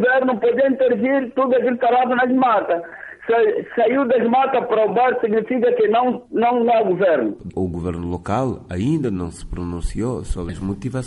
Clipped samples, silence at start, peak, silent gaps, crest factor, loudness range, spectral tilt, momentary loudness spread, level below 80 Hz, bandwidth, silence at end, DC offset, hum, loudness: under 0.1%; 0 s; -8 dBFS; none; 10 dB; 6 LU; -7 dB/octave; 10 LU; -38 dBFS; 11.5 kHz; 0 s; under 0.1%; none; -19 LUFS